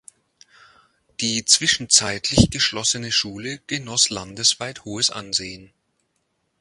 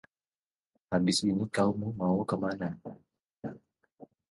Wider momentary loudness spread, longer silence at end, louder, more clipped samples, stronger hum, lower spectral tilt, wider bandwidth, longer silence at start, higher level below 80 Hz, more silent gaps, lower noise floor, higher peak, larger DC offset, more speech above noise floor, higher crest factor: second, 13 LU vs 17 LU; first, 0.95 s vs 0.25 s; first, -19 LUFS vs -30 LUFS; neither; neither; second, -2 dB/octave vs -5.5 dB/octave; about the same, 11.5 kHz vs 11.5 kHz; first, 1.2 s vs 0.9 s; first, -40 dBFS vs -62 dBFS; second, none vs 3.33-3.37 s, 3.94-3.98 s; second, -72 dBFS vs under -90 dBFS; first, 0 dBFS vs -14 dBFS; neither; second, 50 dB vs over 60 dB; first, 24 dB vs 18 dB